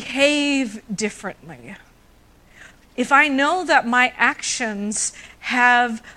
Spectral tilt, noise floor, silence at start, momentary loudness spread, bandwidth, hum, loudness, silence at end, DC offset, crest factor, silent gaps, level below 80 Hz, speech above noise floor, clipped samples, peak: -2 dB/octave; -52 dBFS; 0 s; 18 LU; 13 kHz; none; -18 LUFS; 0.05 s; under 0.1%; 20 dB; none; -56 dBFS; 32 dB; under 0.1%; -2 dBFS